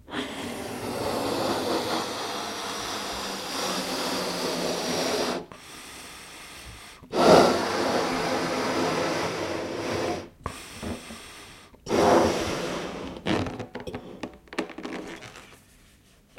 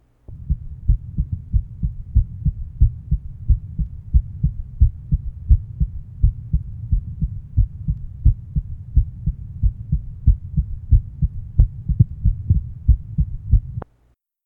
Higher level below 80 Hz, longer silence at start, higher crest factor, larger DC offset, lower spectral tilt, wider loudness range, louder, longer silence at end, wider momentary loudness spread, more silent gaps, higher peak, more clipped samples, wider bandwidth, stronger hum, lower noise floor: second, -54 dBFS vs -22 dBFS; second, 0.1 s vs 0.3 s; about the same, 24 dB vs 20 dB; neither; second, -4 dB/octave vs -13.5 dB/octave; first, 7 LU vs 3 LU; second, -27 LUFS vs -23 LUFS; first, 0.85 s vs 0.6 s; first, 19 LU vs 8 LU; neither; second, -4 dBFS vs 0 dBFS; neither; first, 16.5 kHz vs 1.2 kHz; neither; second, -57 dBFS vs -61 dBFS